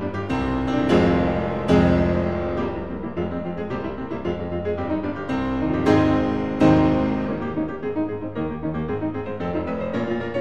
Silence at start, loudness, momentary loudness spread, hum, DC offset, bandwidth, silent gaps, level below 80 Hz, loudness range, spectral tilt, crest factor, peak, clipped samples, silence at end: 0 s; -23 LUFS; 10 LU; none; 0.9%; 9 kHz; none; -38 dBFS; 5 LU; -8 dB/octave; 18 dB; -4 dBFS; under 0.1%; 0 s